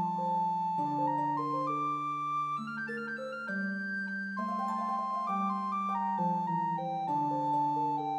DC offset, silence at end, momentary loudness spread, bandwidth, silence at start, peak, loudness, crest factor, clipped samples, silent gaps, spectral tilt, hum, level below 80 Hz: under 0.1%; 0 s; 5 LU; 9.8 kHz; 0 s; -22 dBFS; -33 LUFS; 10 dB; under 0.1%; none; -7 dB/octave; none; under -90 dBFS